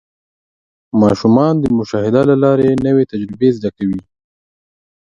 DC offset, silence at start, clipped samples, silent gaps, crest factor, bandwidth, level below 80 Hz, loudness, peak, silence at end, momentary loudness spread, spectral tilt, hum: under 0.1%; 0.95 s; under 0.1%; none; 14 dB; 9.2 kHz; -46 dBFS; -14 LUFS; 0 dBFS; 1 s; 9 LU; -8.5 dB/octave; none